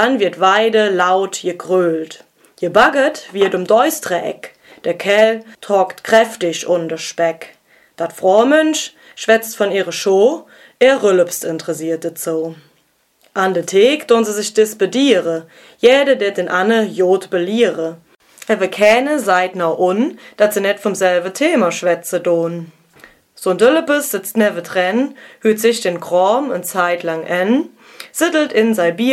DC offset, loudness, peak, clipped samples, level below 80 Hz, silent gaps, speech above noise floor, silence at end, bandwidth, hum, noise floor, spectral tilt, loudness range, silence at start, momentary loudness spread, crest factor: under 0.1%; -15 LUFS; 0 dBFS; under 0.1%; -62 dBFS; none; 44 dB; 0 s; 16 kHz; none; -59 dBFS; -4 dB/octave; 2 LU; 0 s; 11 LU; 16 dB